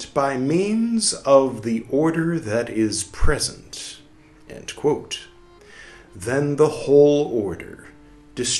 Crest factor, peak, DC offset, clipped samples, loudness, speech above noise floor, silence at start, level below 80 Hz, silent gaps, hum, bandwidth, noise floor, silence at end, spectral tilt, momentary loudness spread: 20 dB; -2 dBFS; under 0.1%; under 0.1%; -20 LUFS; 29 dB; 0 s; -36 dBFS; none; none; 12.5 kHz; -49 dBFS; 0 s; -4.5 dB/octave; 18 LU